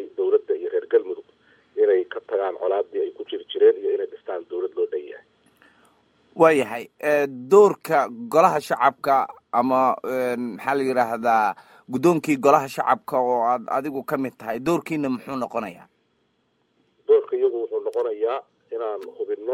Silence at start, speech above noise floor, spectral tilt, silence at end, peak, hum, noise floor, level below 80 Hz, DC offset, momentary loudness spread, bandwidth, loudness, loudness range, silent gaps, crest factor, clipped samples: 0 s; 47 dB; -6 dB/octave; 0 s; -2 dBFS; none; -68 dBFS; -70 dBFS; under 0.1%; 13 LU; 16.5 kHz; -22 LUFS; 6 LU; none; 20 dB; under 0.1%